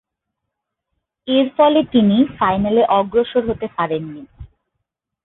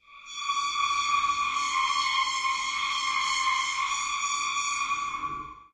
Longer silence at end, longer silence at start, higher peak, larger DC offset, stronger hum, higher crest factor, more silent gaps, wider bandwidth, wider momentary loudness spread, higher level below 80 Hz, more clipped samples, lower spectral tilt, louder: first, 0.8 s vs 0.1 s; first, 1.25 s vs 0.1 s; first, -2 dBFS vs -14 dBFS; neither; neither; about the same, 16 dB vs 14 dB; neither; second, 4.1 kHz vs 11.5 kHz; first, 11 LU vs 7 LU; first, -46 dBFS vs -62 dBFS; neither; first, -11.5 dB/octave vs 2 dB/octave; first, -16 LUFS vs -27 LUFS